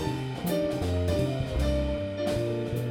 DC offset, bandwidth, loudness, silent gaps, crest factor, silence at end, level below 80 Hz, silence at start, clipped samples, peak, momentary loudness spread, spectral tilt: under 0.1%; 18.5 kHz; -29 LUFS; none; 12 dB; 0 s; -36 dBFS; 0 s; under 0.1%; -16 dBFS; 3 LU; -7 dB/octave